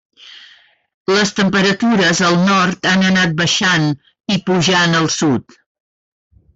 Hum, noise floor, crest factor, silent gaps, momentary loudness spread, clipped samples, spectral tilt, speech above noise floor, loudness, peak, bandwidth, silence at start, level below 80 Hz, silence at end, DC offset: none; -48 dBFS; 12 dB; 0.94-1.05 s; 8 LU; under 0.1%; -4 dB/octave; 33 dB; -14 LUFS; -4 dBFS; 8 kHz; 0.25 s; -52 dBFS; 1.15 s; under 0.1%